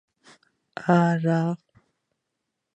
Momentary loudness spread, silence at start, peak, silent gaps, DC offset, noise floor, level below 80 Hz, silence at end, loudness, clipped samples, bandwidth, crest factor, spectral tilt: 16 LU; 0.8 s; -6 dBFS; none; under 0.1%; -81 dBFS; -72 dBFS; 1.2 s; -23 LUFS; under 0.1%; 8.2 kHz; 22 dB; -8.5 dB/octave